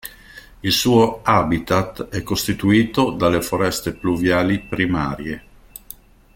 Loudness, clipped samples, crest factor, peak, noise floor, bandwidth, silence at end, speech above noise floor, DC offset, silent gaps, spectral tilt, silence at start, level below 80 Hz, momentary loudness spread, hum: -19 LUFS; under 0.1%; 18 dB; -2 dBFS; -43 dBFS; 17 kHz; 0.95 s; 25 dB; under 0.1%; none; -5 dB/octave; 0.05 s; -42 dBFS; 16 LU; none